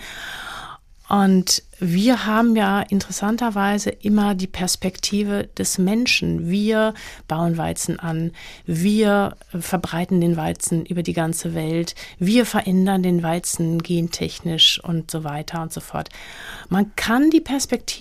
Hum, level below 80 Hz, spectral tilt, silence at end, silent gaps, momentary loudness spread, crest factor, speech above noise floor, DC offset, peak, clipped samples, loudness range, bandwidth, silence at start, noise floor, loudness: none; -46 dBFS; -4.5 dB/octave; 0 s; none; 12 LU; 16 dB; 20 dB; under 0.1%; -4 dBFS; under 0.1%; 3 LU; 15.5 kHz; 0 s; -40 dBFS; -20 LUFS